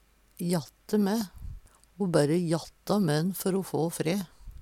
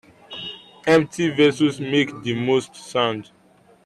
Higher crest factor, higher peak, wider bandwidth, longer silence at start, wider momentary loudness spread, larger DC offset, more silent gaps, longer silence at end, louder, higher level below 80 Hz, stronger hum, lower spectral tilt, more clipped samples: about the same, 20 dB vs 16 dB; second, -10 dBFS vs -6 dBFS; first, 17 kHz vs 12 kHz; about the same, 0.4 s vs 0.3 s; second, 11 LU vs 15 LU; neither; neither; second, 0 s vs 0.6 s; second, -29 LUFS vs -20 LUFS; first, -52 dBFS vs -62 dBFS; neither; about the same, -6 dB/octave vs -5.5 dB/octave; neither